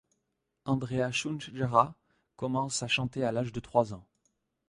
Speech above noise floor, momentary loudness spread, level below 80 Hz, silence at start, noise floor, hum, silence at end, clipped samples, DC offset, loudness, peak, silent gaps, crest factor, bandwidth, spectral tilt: 51 dB; 10 LU; -62 dBFS; 0.65 s; -81 dBFS; none; 0.65 s; under 0.1%; under 0.1%; -31 LUFS; -8 dBFS; none; 24 dB; 11.5 kHz; -5 dB/octave